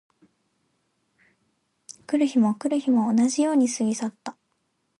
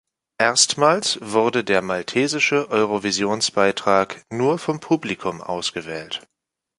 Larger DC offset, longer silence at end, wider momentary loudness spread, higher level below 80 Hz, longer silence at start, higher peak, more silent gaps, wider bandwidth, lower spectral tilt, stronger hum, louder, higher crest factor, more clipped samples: neither; about the same, 0.7 s vs 0.6 s; first, 15 LU vs 11 LU; second, -76 dBFS vs -60 dBFS; first, 2.1 s vs 0.4 s; second, -12 dBFS vs -2 dBFS; neither; about the same, 11.5 kHz vs 11.5 kHz; first, -5 dB/octave vs -3 dB/octave; neither; second, -23 LUFS vs -20 LUFS; second, 14 dB vs 20 dB; neither